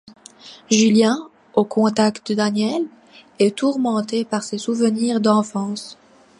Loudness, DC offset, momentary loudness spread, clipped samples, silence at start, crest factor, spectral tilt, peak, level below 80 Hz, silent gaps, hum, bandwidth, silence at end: -19 LUFS; under 0.1%; 10 LU; under 0.1%; 0.05 s; 18 dB; -4.5 dB/octave; -2 dBFS; -68 dBFS; none; none; 11 kHz; 0.45 s